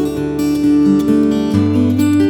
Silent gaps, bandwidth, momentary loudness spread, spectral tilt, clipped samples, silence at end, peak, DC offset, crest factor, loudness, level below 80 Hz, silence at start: none; 17.5 kHz; 5 LU; -7.5 dB/octave; under 0.1%; 0 s; 0 dBFS; under 0.1%; 12 dB; -14 LUFS; -40 dBFS; 0 s